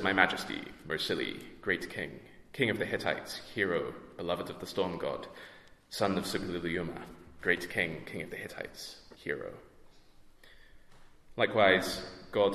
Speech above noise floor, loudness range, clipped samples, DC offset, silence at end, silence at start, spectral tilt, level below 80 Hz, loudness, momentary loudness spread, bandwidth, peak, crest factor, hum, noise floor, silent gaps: 23 dB; 6 LU; under 0.1%; under 0.1%; 0 s; 0 s; -4.5 dB/octave; -60 dBFS; -33 LUFS; 18 LU; 14 kHz; -6 dBFS; 28 dB; none; -56 dBFS; none